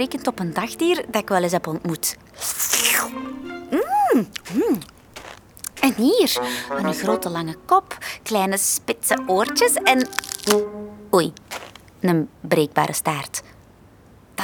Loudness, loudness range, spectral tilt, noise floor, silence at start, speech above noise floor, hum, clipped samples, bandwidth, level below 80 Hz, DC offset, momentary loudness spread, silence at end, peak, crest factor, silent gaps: -21 LUFS; 3 LU; -3.5 dB/octave; -49 dBFS; 0 s; 28 dB; none; under 0.1%; over 20 kHz; -56 dBFS; under 0.1%; 16 LU; 0 s; -2 dBFS; 20 dB; none